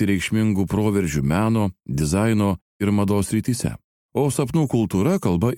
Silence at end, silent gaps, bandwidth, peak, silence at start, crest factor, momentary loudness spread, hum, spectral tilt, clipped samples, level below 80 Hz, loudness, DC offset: 0 s; 2.62-2.80 s, 3.84-4.09 s; 16.5 kHz; -6 dBFS; 0 s; 14 dB; 5 LU; none; -6.5 dB/octave; under 0.1%; -42 dBFS; -21 LUFS; under 0.1%